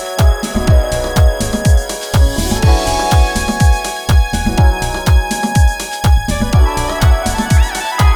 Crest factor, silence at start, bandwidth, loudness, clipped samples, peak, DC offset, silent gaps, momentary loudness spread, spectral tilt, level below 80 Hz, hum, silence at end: 12 dB; 0 s; 18 kHz; -14 LUFS; under 0.1%; 0 dBFS; under 0.1%; none; 3 LU; -5 dB/octave; -14 dBFS; none; 0 s